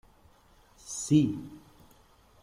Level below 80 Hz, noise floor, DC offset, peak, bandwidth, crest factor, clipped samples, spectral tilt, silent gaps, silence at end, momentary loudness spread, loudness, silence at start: -62 dBFS; -60 dBFS; under 0.1%; -12 dBFS; 14.5 kHz; 20 dB; under 0.1%; -6 dB/octave; none; 0.85 s; 23 LU; -28 LUFS; 0.85 s